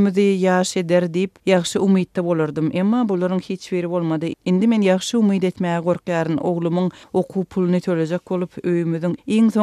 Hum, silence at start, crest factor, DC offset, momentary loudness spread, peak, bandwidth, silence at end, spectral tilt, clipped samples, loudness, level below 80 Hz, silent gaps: none; 0 s; 16 dB; under 0.1%; 6 LU; -2 dBFS; 12.5 kHz; 0 s; -6.5 dB/octave; under 0.1%; -20 LUFS; -62 dBFS; none